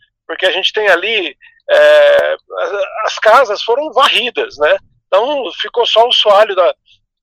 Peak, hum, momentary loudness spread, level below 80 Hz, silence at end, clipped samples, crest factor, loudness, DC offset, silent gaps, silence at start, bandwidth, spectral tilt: 0 dBFS; none; 10 LU; -58 dBFS; 0.5 s; under 0.1%; 12 dB; -12 LUFS; under 0.1%; none; 0.3 s; 14.5 kHz; -1 dB/octave